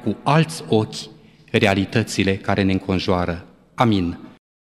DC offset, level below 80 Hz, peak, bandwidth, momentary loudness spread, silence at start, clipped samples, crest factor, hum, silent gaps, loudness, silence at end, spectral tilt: under 0.1%; -48 dBFS; -2 dBFS; 14 kHz; 15 LU; 0 s; under 0.1%; 20 dB; none; none; -20 LUFS; 0.4 s; -6 dB/octave